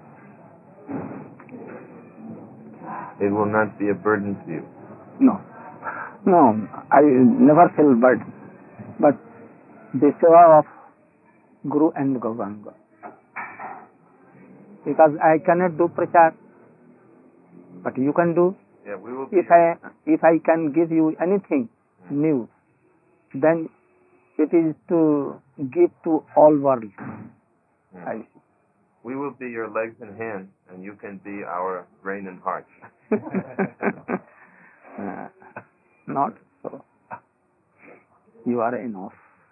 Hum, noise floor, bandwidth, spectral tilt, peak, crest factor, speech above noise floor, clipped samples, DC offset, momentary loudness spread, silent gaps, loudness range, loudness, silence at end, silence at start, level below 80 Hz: none; -65 dBFS; 2.9 kHz; -13.5 dB/octave; -4 dBFS; 18 dB; 46 dB; under 0.1%; under 0.1%; 24 LU; none; 15 LU; -20 LUFS; 0.45 s; 0.9 s; -76 dBFS